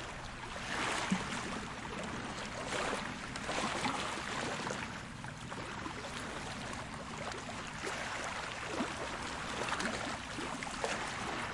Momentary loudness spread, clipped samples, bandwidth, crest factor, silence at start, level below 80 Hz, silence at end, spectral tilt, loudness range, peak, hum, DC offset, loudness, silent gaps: 7 LU; under 0.1%; 11.5 kHz; 20 dB; 0 s; -56 dBFS; 0 s; -3.5 dB/octave; 3 LU; -20 dBFS; none; under 0.1%; -39 LUFS; none